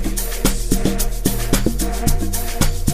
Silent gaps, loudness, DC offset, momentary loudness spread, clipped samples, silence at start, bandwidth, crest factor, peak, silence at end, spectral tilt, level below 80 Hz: none; -21 LUFS; 5%; 3 LU; under 0.1%; 0 s; 15.5 kHz; 18 dB; 0 dBFS; 0 s; -4.5 dB/octave; -20 dBFS